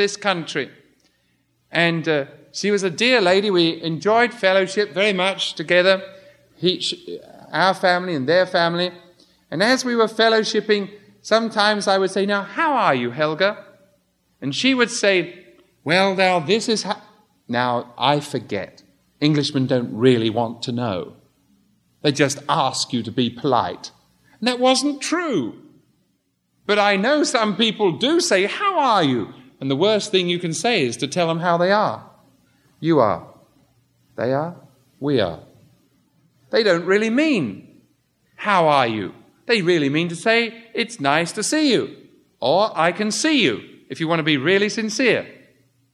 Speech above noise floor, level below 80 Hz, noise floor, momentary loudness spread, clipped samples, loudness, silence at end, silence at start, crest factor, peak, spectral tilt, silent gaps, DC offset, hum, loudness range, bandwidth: 49 dB; -68 dBFS; -68 dBFS; 12 LU; under 0.1%; -19 LUFS; 0.6 s; 0 s; 20 dB; -2 dBFS; -4 dB/octave; none; under 0.1%; none; 4 LU; 13 kHz